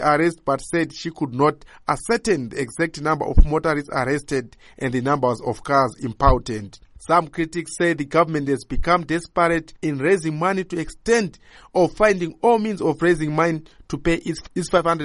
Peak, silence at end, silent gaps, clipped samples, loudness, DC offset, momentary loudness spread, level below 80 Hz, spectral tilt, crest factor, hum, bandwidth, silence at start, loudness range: -2 dBFS; 0 s; none; under 0.1%; -21 LUFS; under 0.1%; 8 LU; -30 dBFS; -6 dB/octave; 20 dB; none; 11.5 kHz; 0 s; 2 LU